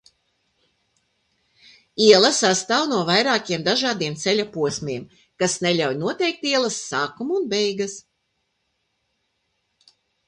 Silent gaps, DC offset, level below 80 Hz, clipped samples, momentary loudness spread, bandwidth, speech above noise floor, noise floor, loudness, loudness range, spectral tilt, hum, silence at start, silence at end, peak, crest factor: none; under 0.1%; -66 dBFS; under 0.1%; 13 LU; 11 kHz; 52 dB; -73 dBFS; -20 LUFS; 7 LU; -3 dB/octave; none; 1.95 s; 2.3 s; 0 dBFS; 24 dB